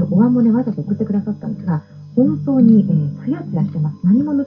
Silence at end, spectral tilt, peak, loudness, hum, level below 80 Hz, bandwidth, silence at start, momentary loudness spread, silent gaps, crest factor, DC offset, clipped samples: 0 s; -12.5 dB/octave; -2 dBFS; -17 LUFS; none; -56 dBFS; 5.4 kHz; 0 s; 11 LU; none; 14 dB; under 0.1%; under 0.1%